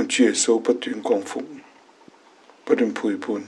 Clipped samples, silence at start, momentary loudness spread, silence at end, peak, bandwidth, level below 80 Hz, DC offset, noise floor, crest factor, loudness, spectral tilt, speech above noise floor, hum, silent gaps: under 0.1%; 0 s; 15 LU; 0 s; -4 dBFS; 11.5 kHz; -82 dBFS; under 0.1%; -52 dBFS; 20 dB; -22 LUFS; -2.5 dB/octave; 31 dB; none; none